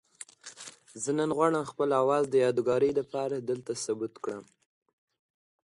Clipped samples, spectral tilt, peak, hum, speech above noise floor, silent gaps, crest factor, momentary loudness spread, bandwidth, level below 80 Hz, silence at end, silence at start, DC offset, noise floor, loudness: under 0.1%; -5 dB/octave; -12 dBFS; none; 21 dB; none; 18 dB; 19 LU; 11.5 kHz; -72 dBFS; 1.3 s; 0.45 s; under 0.1%; -49 dBFS; -29 LUFS